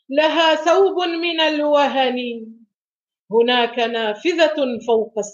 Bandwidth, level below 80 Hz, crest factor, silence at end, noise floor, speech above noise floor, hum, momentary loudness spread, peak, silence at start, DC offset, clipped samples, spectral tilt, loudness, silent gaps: 7.6 kHz; -72 dBFS; 16 dB; 0 s; under -90 dBFS; over 72 dB; none; 6 LU; -4 dBFS; 0.1 s; under 0.1%; under 0.1%; -3 dB/octave; -18 LUFS; 2.76-3.07 s, 3.19-3.26 s